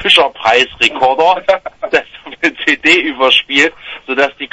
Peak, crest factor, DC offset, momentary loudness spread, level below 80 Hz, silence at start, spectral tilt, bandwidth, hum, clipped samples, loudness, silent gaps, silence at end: 0 dBFS; 12 dB; under 0.1%; 8 LU; -50 dBFS; 0 s; -2 dB/octave; 11 kHz; none; 0.2%; -11 LUFS; none; 0.05 s